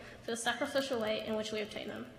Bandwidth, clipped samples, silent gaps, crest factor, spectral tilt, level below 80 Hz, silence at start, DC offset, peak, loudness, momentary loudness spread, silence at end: 15.5 kHz; under 0.1%; none; 18 dB; -3 dB/octave; -68 dBFS; 0 s; under 0.1%; -18 dBFS; -36 LUFS; 7 LU; 0 s